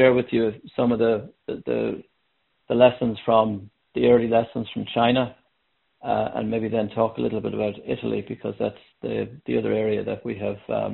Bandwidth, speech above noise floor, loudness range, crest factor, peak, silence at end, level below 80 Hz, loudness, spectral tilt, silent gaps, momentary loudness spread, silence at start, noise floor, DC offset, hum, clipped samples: 4.2 kHz; 49 dB; 5 LU; 22 dB; -2 dBFS; 0 s; -56 dBFS; -24 LUFS; -5 dB/octave; none; 12 LU; 0 s; -72 dBFS; under 0.1%; none; under 0.1%